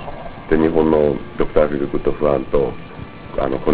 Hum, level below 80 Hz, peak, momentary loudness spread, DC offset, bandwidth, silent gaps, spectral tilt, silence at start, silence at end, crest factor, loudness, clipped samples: none; -34 dBFS; 0 dBFS; 18 LU; 0.7%; 4 kHz; none; -11.5 dB/octave; 0 s; 0 s; 18 dB; -18 LUFS; under 0.1%